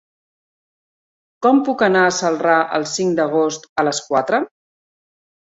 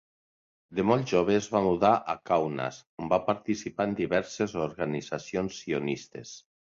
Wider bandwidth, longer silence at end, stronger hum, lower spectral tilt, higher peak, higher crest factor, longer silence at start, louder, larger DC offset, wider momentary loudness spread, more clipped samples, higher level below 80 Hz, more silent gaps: about the same, 8 kHz vs 7.6 kHz; first, 0.95 s vs 0.35 s; neither; second, -4 dB/octave vs -6 dB/octave; first, -2 dBFS vs -8 dBFS; about the same, 16 dB vs 20 dB; first, 1.4 s vs 0.7 s; first, -17 LUFS vs -28 LUFS; neither; second, 6 LU vs 12 LU; neither; about the same, -64 dBFS vs -60 dBFS; about the same, 3.69-3.76 s vs 2.86-2.97 s